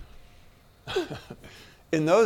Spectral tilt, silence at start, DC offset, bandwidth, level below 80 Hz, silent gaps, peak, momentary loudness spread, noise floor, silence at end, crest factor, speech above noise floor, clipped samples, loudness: -5.5 dB/octave; 0 s; under 0.1%; 16.5 kHz; -54 dBFS; none; -10 dBFS; 23 LU; -54 dBFS; 0 s; 18 dB; 29 dB; under 0.1%; -29 LUFS